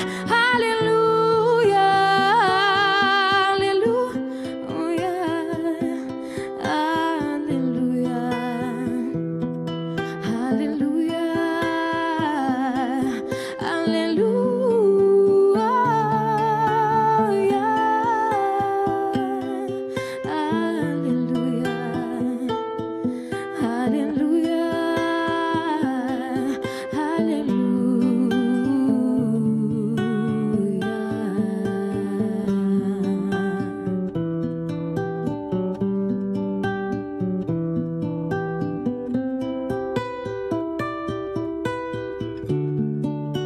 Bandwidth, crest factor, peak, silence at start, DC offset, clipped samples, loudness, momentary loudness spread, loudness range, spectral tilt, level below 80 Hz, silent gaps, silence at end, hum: 13.5 kHz; 14 dB; -8 dBFS; 0 s; under 0.1%; under 0.1%; -22 LUFS; 10 LU; 7 LU; -6.5 dB/octave; -56 dBFS; none; 0 s; none